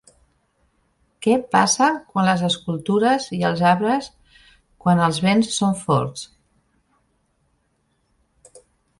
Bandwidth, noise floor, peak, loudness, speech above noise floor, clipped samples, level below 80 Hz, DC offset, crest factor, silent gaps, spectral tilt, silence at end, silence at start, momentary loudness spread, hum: 11.5 kHz; -68 dBFS; -4 dBFS; -19 LUFS; 49 dB; under 0.1%; -58 dBFS; under 0.1%; 18 dB; none; -4.5 dB/octave; 2.75 s; 1.2 s; 8 LU; none